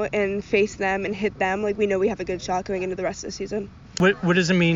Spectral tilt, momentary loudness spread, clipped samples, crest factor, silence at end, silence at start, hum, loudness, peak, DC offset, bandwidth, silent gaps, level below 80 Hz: -4.5 dB/octave; 10 LU; under 0.1%; 16 dB; 0 s; 0 s; none; -24 LUFS; -6 dBFS; under 0.1%; 7.4 kHz; none; -48 dBFS